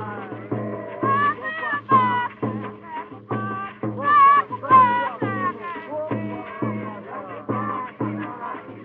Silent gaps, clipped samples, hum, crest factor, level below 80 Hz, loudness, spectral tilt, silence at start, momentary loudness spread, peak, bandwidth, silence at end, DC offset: none; under 0.1%; none; 20 dB; -66 dBFS; -22 LUFS; -4.5 dB/octave; 0 s; 18 LU; -4 dBFS; 4.4 kHz; 0 s; under 0.1%